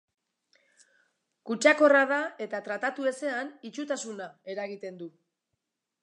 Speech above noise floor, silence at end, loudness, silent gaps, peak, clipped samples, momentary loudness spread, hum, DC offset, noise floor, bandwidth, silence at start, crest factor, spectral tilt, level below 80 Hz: 55 dB; 0.95 s; -27 LUFS; none; -8 dBFS; under 0.1%; 20 LU; none; under 0.1%; -83 dBFS; 11 kHz; 1.45 s; 22 dB; -3 dB/octave; -88 dBFS